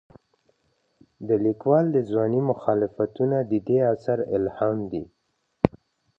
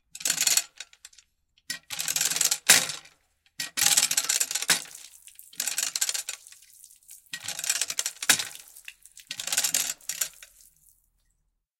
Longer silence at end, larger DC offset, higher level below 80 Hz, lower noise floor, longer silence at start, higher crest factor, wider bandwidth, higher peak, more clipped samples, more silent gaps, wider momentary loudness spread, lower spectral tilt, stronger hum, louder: second, 0.5 s vs 1.35 s; neither; first, -56 dBFS vs -72 dBFS; about the same, -73 dBFS vs -75 dBFS; first, 1.2 s vs 0.15 s; about the same, 24 dB vs 28 dB; second, 5.8 kHz vs 17 kHz; about the same, 0 dBFS vs -2 dBFS; neither; neither; second, 7 LU vs 22 LU; first, -10.5 dB/octave vs 2 dB/octave; neither; about the same, -24 LUFS vs -24 LUFS